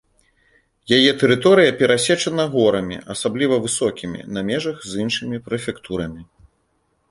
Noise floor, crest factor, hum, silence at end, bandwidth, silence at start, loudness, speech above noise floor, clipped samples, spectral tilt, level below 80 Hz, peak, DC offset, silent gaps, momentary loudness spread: -66 dBFS; 20 dB; none; 0.9 s; 11.5 kHz; 0.9 s; -19 LUFS; 48 dB; under 0.1%; -4 dB/octave; -52 dBFS; 0 dBFS; under 0.1%; none; 14 LU